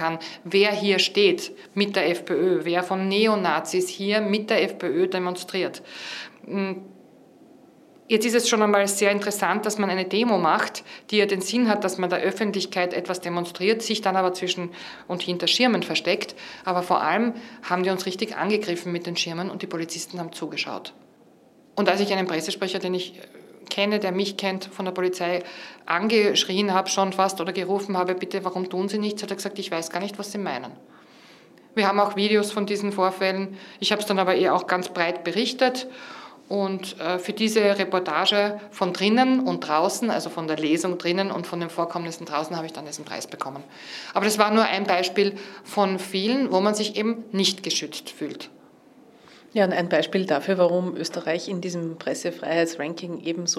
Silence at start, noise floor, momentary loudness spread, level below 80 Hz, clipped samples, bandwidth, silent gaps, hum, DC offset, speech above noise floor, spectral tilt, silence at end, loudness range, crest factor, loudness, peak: 0 s; -54 dBFS; 12 LU; -78 dBFS; under 0.1%; 15 kHz; none; none; under 0.1%; 30 dB; -4 dB/octave; 0 s; 5 LU; 24 dB; -24 LUFS; 0 dBFS